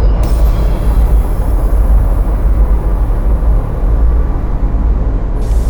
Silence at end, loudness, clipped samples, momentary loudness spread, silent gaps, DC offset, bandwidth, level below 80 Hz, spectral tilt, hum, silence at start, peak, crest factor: 0 s; -15 LUFS; under 0.1%; 4 LU; none; under 0.1%; 19 kHz; -10 dBFS; -8.5 dB/octave; none; 0 s; -2 dBFS; 8 dB